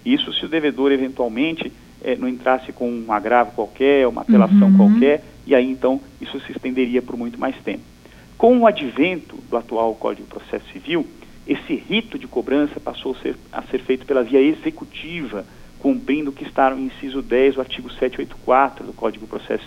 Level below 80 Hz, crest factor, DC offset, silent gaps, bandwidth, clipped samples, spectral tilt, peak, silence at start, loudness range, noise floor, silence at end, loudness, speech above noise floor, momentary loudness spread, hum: -48 dBFS; 18 dB; under 0.1%; none; 8.4 kHz; under 0.1%; -7.5 dB/octave; -2 dBFS; 0.05 s; 8 LU; -41 dBFS; 0 s; -19 LUFS; 22 dB; 15 LU; none